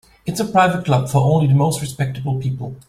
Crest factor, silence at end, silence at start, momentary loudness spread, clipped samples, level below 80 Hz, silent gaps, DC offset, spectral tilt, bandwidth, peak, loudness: 16 dB; 0.1 s; 0.25 s; 9 LU; under 0.1%; -48 dBFS; none; under 0.1%; -6.5 dB/octave; 15 kHz; -2 dBFS; -18 LUFS